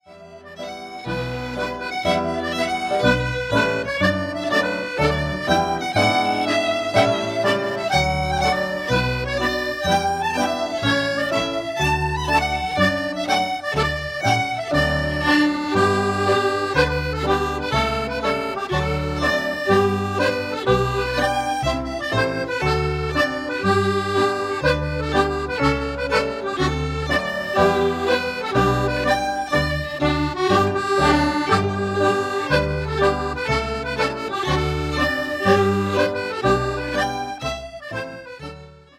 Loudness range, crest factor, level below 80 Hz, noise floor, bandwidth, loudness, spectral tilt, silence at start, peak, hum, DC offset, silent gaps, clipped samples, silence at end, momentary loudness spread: 2 LU; 18 dB; -36 dBFS; -42 dBFS; 16 kHz; -21 LUFS; -5 dB/octave; 0.1 s; -2 dBFS; none; under 0.1%; none; under 0.1%; 0.25 s; 6 LU